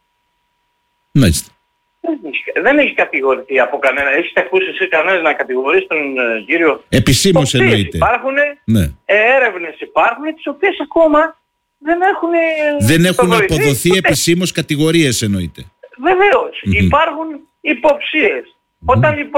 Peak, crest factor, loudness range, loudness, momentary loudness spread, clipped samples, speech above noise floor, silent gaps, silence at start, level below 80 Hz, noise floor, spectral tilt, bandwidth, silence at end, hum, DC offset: -2 dBFS; 12 dB; 2 LU; -13 LUFS; 8 LU; under 0.1%; 51 dB; none; 1.15 s; -36 dBFS; -65 dBFS; -5 dB/octave; 17 kHz; 0 s; none; under 0.1%